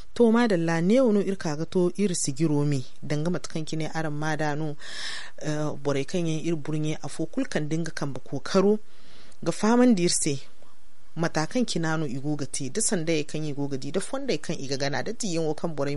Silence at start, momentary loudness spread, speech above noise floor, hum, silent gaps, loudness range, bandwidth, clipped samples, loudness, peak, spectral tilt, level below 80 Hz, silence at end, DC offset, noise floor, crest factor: 0 s; 11 LU; 34 dB; none; none; 5 LU; 11.5 kHz; under 0.1%; -27 LUFS; -10 dBFS; -5 dB/octave; -60 dBFS; 0 s; 3%; -60 dBFS; 18 dB